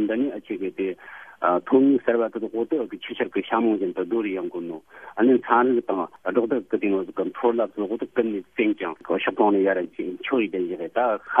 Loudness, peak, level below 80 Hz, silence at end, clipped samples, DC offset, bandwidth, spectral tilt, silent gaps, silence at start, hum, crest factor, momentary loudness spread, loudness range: -24 LUFS; -2 dBFS; -70 dBFS; 0 s; under 0.1%; under 0.1%; 3.7 kHz; -8 dB/octave; none; 0 s; none; 22 dB; 11 LU; 2 LU